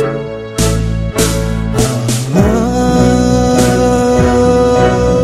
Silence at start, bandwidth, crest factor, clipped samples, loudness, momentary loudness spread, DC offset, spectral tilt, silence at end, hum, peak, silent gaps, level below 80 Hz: 0 s; 15 kHz; 10 dB; 0.2%; -12 LUFS; 6 LU; under 0.1%; -6 dB/octave; 0 s; none; 0 dBFS; none; -22 dBFS